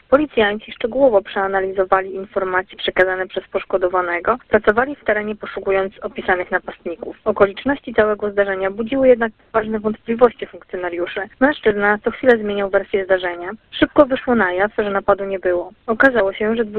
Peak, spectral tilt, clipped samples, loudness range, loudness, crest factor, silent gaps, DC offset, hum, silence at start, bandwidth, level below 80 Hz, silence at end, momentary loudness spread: 0 dBFS; -7.5 dB/octave; under 0.1%; 2 LU; -18 LUFS; 18 dB; none; under 0.1%; none; 0.1 s; 4.5 kHz; -46 dBFS; 0 s; 10 LU